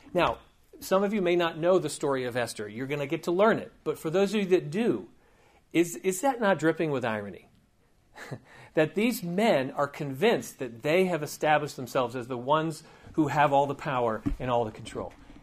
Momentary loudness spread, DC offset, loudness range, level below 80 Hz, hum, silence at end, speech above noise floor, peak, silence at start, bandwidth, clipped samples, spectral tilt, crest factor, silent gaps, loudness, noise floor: 11 LU; under 0.1%; 3 LU; -54 dBFS; none; 0 s; 37 dB; -10 dBFS; 0.05 s; 15.5 kHz; under 0.1%; -5.5 dB/octave; 18 dB; none; -28 LUFS; -64 dBFS